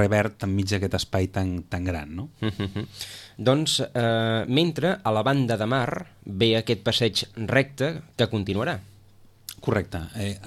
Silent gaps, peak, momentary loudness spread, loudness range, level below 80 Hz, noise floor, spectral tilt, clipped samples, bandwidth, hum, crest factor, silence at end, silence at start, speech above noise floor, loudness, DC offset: none; -6 dBFS; 11 LU; 4 LU; -50 dBFS; -52 dBFS; -5.5 dB/octave; under 0.1%; 15 kHz; none; 18 dB; 0 s; 0 s; 28 dB; -25 LUFS; under 0.1%